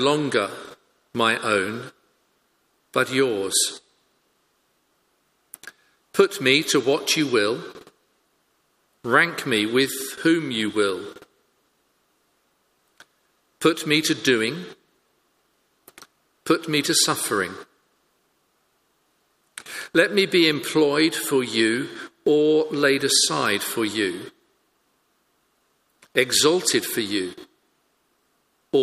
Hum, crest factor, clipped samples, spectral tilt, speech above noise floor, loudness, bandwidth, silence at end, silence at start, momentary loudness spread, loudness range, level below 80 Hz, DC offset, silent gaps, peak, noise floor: none; 22 dB; under 0.1%; -3 dB/octave; 47 dB; -21 LUFS; 15.5 kHz; 0 s; 0 s; 18 LU; 6 LU; -70 dBFS; under 0.1%; none; -2 dBFS; -68 dBFS